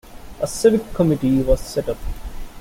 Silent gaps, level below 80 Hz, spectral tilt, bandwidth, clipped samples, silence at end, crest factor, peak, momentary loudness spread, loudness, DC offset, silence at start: none; -30 dBFS; -6.5 dB/octave; 17 kHz; under 0.1%; 0 s; 18 dB; -2 dBFS; 16 LU; -20 LUFS; under 0.1%; 0.05 s